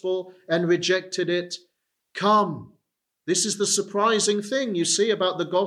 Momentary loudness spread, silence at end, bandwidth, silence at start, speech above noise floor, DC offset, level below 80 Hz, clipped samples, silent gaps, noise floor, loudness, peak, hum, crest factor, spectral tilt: 11 LU; 0 s; 13.5 kHz; 0.05 s; 55 dB; under 0.1%; -76 dBFS; under 0.1%; none; -78 dBFS; -23 LUFS; -8 dBFS; none; 16 dB; -3 dB/octave